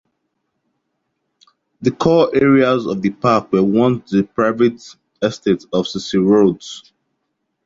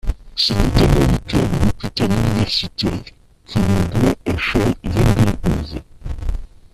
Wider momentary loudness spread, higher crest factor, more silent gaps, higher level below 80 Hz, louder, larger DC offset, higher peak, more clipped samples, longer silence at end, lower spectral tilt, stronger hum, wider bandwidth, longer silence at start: second, 10 LU vs 14 LU; about the same, 16 dB vs 16 dB; neither; second, -54 dBFS vs -26 dBFS; about the same, -16 LUFS vs -18 LUFS; neither; about the same, -2 dBFS vs 0 dBFS; neither; first, 0.85 s vs 0.3 s; about the same, -6.5 dB/octave vs -6 dB/octave; neither; second, 7.8 kHz vs 14 kHz; first, 1.8 s vs 0.05 s